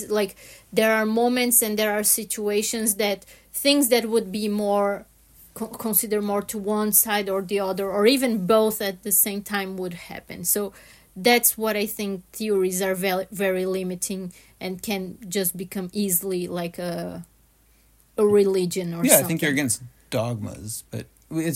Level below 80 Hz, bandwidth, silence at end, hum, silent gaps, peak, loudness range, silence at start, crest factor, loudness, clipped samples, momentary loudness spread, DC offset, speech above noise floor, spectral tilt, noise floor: -58 dBFS; 16.5 kHz; 0 s; none; none; 0 dBFS; 6 LU; 0 s; 24 dB; -22 LUFS; under 0.1%; 14 LU; under 0.1%; 35 dB; -3.5 dB/octave; -58 dBFS